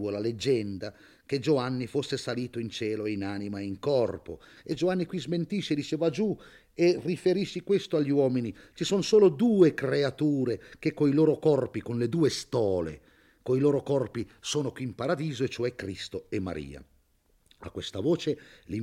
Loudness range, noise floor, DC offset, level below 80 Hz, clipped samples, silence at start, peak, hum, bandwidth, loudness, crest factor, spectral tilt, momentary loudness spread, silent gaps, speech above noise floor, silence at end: 8 LU; -67 dBFS; under 0.1%; -62 dBFS; under 0.1%; 0 s; -10 dBFS; none; 13.5 kHz; -28 LUFS; 20 dB; -6 dB/octave; 14 LU; none; 39 dB; 0 s